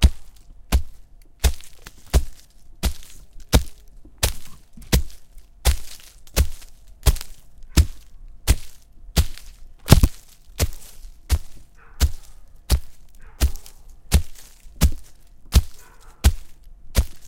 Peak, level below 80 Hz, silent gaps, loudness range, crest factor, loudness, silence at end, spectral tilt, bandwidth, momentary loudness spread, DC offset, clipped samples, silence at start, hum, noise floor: 0 dBFS; -24 dBFS; none; 4 LU; 22 dB; -24 LUFS; 0 s; -4.5 dB/octave; 17 kHz; 20 LU; under 0.1%; under 0.1%; 0 s; none; -42 dBFS